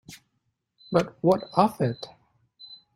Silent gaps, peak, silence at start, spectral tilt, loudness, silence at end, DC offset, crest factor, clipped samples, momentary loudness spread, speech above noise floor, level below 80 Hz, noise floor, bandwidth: none; -4 dBFS; 0.1 s; -7 dB/octave; -25 LUFS; 0.2 s; under 0.1%; 24 dB; under 0.1%; 21 LU; 52 dB; -64 dBFS; -76 dBFS; 16 kHz